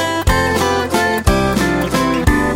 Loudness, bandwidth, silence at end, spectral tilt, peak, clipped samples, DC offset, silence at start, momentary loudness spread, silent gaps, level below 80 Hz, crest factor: -15 LUFS; 16.5 kHz; 0 s; -5 dB/octave; 0 dBFS; under 0.1%; under 0.1%; 0 s; 1 LU; none; -24 dBFS; 14 dB